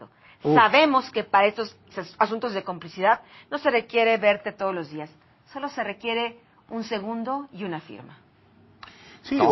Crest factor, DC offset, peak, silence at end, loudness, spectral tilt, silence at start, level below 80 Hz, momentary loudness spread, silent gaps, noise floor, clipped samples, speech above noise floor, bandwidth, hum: 22 dB; under 0.1%; -4 dBFS; 0 s; -24 LUFS; -6 dB/octave; 0 s; -66 dBFS; 18 LU; none; -56 dBFS; under 0.1%; 32 dB; 6 kHz; none